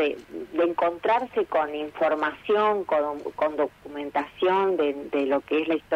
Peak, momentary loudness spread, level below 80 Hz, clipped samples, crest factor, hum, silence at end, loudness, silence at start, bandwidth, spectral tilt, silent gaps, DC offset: -12 dBFS; 7 LU; -62 dBFS; under 0.1%; 14 dB; 50 Hz at -60 dBFS; 0 s; -25 LUFS; 0 s; 9.2 kHz; -6 dB/octave; none; under 0.1%